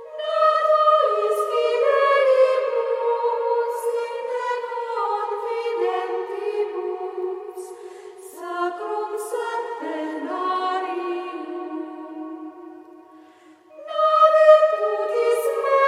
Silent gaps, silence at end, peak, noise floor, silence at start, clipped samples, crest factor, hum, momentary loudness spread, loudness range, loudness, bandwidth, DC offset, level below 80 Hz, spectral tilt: none; 0 s; -2 dBFS; -50 dBFS; 0 s; under 0.1%; 20 dB; none; 18 LU; 10 LU; -21 LUFS; 15.5 kHz; under 0.1%; under -90 dBFS; -1.5 dB/octave